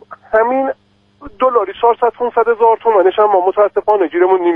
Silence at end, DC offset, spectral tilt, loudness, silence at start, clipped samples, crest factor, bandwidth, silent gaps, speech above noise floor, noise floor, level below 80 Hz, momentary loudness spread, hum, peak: 0 s; under 0.1%; -7 dB/octave; -13 LUFS; 0.1 s; under 0.1%; 12 dB; 3.7 kHz; none; 25 dB; -38 dBFS; -52 dBFS; 6 LU; none; 0 dBFS